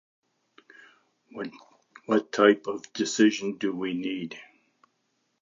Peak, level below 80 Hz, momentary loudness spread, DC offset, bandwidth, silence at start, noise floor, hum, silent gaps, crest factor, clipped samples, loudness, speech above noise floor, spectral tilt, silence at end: -4 dBFS; -78 dBFS; 18 LU; under 0.1%; 7.6 kHz; 1.35 s; -75 dBFS; none; none; 24 dB; under 0.1%; -26 LUFS; 49 dB; -4 dB/octave; 0.95 s